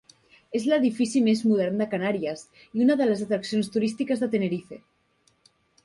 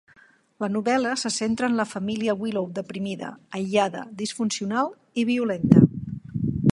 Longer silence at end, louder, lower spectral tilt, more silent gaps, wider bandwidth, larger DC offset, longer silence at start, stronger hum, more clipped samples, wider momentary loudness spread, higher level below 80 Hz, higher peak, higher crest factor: first, 1.05 s vs 0 s; about the same, -25 LUFS vs -24 LUFS; about the same, -6 dB/octave vs -6 dB/octave; neither; about the same, 11.5 kHz vs 11.5 kHz; neither; about the same, 0.5 s vs 0.6 s; neither; neither; second, 11 LU vs 14 LU; second, -68 dBFS vs -52 dBFS; second, -10 dBFS vs 0 dBFS; second, 14 dB vs 24 dB